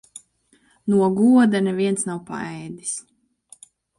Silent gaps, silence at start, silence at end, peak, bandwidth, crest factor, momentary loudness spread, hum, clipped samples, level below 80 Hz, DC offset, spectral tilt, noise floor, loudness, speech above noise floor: none; 0.15 s; 1 s; -6 dBFS; 11.5 kHz; 16 dB; 16 LU; none; under 0.1%; -66 dBFS; under 0.1%; -5.5 dB/octave; -61 dBFS; -21 LUFS; 41 dB